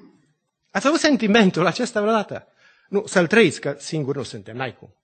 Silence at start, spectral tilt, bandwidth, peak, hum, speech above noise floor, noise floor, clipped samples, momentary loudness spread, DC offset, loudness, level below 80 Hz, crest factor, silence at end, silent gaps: 0.75 s; -5 dB/octave; 9.2 kHz; -2 dBFS; none; 48 dB; -68 dBFS; under 0.1%; 14 LU; under 0.1%; -20 LUFS; -62 dBFS; 20 dB; 0.15 s; none